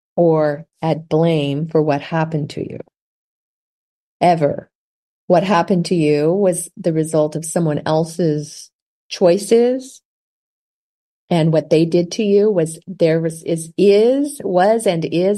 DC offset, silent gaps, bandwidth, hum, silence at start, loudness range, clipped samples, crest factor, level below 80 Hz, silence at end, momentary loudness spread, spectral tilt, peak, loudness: under 0.1%; 3.01-4.20 s, 4.75-5.28 s, 8.73-9.10 s, 10.05-11.28 s; 12.5 kHz; none; 0.15 s; 5 LU; under 0.1%; 16 dB; -62 dBFS; 0 s; 9 LU; -6 dB/octave; -2 dBFS; -17 LUFS